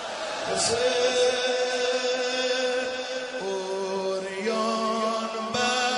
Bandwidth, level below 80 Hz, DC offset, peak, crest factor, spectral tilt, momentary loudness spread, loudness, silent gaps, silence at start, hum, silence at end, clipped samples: 10.5 kHz; -66 dBFS; under 0.1%; -10 dBFS; 16 dB; -2 dB/octave; 8 LU; -26 LUFS; none; 0 s; none; 0 s; under 0.1%